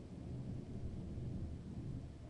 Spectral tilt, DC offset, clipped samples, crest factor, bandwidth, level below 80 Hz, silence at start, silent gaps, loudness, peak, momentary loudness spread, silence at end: -8.5 dB/octave; under 0.1%; under 0.1%; 12 dB; 11 kHz; -54 dBFS; 0 s; none; -48 LUFS; -34 dBFS; 2 LU; 0 s